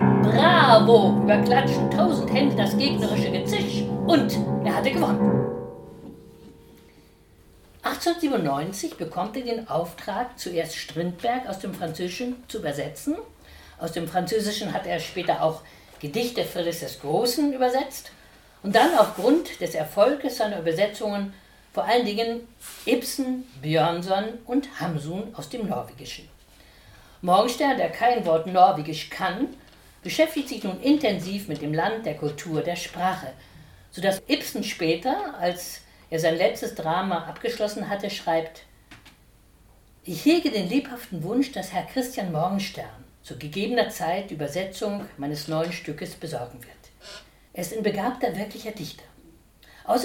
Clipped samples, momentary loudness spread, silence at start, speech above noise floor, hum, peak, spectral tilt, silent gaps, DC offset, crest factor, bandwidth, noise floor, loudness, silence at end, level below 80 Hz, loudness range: under 0.1%; 15 LU; 0 s; 31 dB; none; -2 dBFS; -5.5 dB/octave; none; under 0.1%; 24 dB; 18 kHz; -55 dBFS; -24 LUFS; 0 s; -56 dBFS; 8 LU